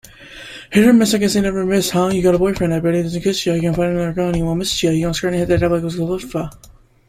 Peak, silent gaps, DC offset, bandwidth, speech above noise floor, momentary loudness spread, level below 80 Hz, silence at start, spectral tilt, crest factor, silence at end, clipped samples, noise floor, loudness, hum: -2 dBFS; none; under 0.1%; 16 kHz; 21 dB; 11 LU; -38 dBFS; 0.2 s; -5.5 dB/octave; 16 dB; 0.4 s; under 0.1%; -37 dBFS; -17 LUFS; none